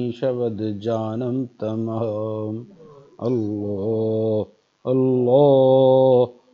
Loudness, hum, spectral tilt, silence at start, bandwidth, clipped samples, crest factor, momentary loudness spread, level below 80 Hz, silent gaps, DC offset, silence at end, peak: -20 LUFS; none; -10 dB/octave; 0 s; 6.4 kHz; under 0.1%; 16 dB; 13 LU; -68 dBFS; none; under 0.1%; 0.2 s; -4 dBFS